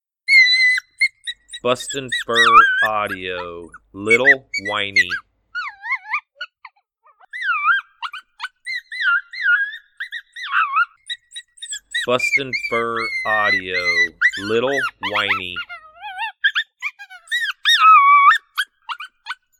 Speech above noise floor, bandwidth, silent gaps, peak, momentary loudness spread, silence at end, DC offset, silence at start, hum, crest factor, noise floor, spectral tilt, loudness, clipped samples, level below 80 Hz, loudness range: 39 dB; 17.5 kHz; none; 0 dBFS; 20 LU; 0.25 s; under 0.1%; 0.3 s; none; 20 dB; -58 dBFS; -1.5 dB/octave; -16 LUFS; under 0.1%; -60 dBFS; 8 LU